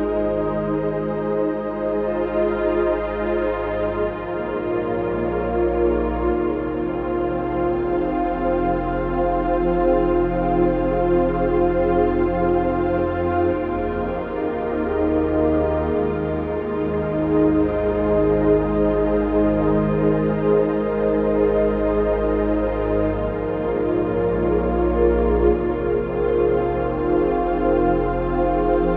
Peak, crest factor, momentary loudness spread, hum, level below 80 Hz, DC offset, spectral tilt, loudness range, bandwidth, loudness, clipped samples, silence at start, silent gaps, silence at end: -4 dBFS; 14 dB; 5 LU; none; -32 dBFS; under 0.1%; -11 dB/octave; 3 LU; 4.5 kHz; -21 LUFS; under 0.1%; 0 s; none; 0 s